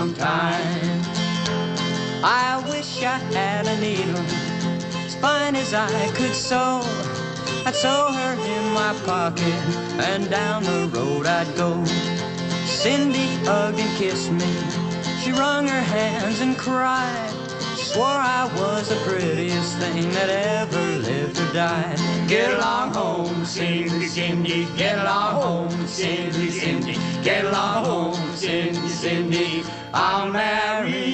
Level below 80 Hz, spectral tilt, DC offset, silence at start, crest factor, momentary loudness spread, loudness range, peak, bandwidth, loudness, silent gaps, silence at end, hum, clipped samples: -56 dBFS; -4.5 dB/octave; under 0.1%; 0 s; 18 dB; 5 LU; 1 LU; -4 dBFS; 8.8 kHz; -22 LUFS; none; 0 s; none; under 0.1%